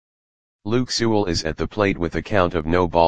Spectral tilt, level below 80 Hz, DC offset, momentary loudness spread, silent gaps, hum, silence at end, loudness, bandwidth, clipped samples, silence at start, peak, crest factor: -5.5 dB/octave; -40 dBFS; 2%; 5 LU; none; none; 0 s; -21 LUFS; 9.8 kHz; under 0.1%; 0.6 s; 0 dBFS; 20 dB